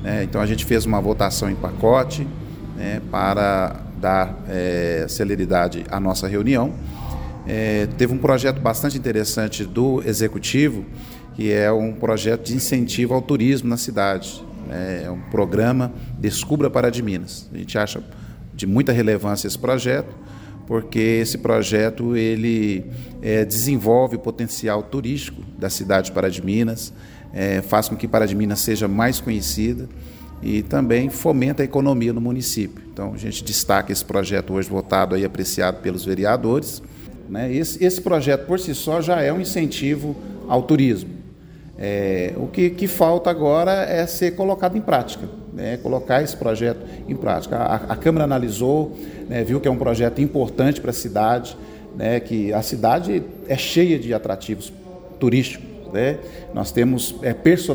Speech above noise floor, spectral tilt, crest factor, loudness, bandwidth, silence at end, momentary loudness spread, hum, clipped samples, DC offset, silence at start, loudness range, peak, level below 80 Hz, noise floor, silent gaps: 21 dB; -5.5 dB/octave; 20 dB; -21 LUFS; over 20 kHz; 0 s; 12 LU; none; under 0.1%; under 0.1%; 0 s; 2 LU; -2 dBFS; -40 dBFS; -41 dBFS; none